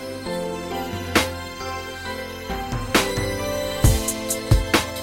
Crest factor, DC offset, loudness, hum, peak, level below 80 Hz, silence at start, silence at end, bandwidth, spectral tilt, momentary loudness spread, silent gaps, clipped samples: 20 dB; under 0.1%; -23 LUFS; none; -4 dBFS; -30 dBFS; 0 s; 0 s; 16.5 kHz; -4 dB/octave; 11 LU; none; under 0.1%